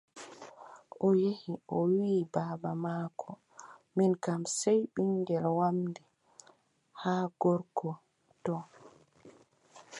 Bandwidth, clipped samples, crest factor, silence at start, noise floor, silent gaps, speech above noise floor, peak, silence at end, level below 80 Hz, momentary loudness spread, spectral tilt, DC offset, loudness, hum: 11.5 kHz; under 0.1%; 18 dB; 0.15 s; -66 dBFS; none; 35 dB; -14 dBFS; 0 s; -80 dBFS; 21 LU; -6.5 dB/octave; under 0.1%; -32 LUFS; none